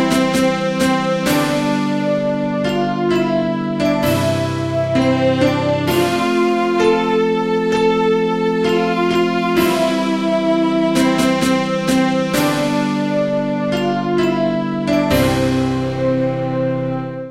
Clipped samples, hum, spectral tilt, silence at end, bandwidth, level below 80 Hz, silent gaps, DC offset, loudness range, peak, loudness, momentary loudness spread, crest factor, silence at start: under 0.1%; none; -5.5 dB/octave; 0 s; 16 kHz; -44 dBFS; none; 0.4%; 2 LU; -2 dBFS; -17 LUFS; 4 LU; 14 dB; 0 s